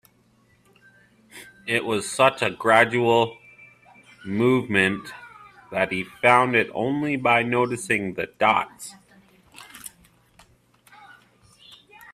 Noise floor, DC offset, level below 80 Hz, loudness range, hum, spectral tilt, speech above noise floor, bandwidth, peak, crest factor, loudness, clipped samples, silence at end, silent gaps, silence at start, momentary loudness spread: -61 dBFS; under 0.1%; -64 dBFS; 6 LU; none; -4.5 dB/octave; 39 dB; 15.5 kHz; -2 dBFS; 22 dB; -21 LUFS; under 0.1%; 0 s; none; 1.35 s; 22 LU